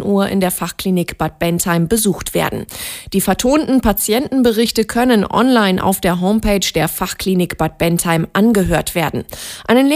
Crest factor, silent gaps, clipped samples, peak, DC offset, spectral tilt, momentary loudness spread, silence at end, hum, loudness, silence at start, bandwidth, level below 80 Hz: 14 dB; none; under 0.1%; 0 dBFS; under 0.1%; -4.5 dB/octave; 7 LU; 0 s; none; -15 LUFS; 0 s; 16 kHz; -34 dBFS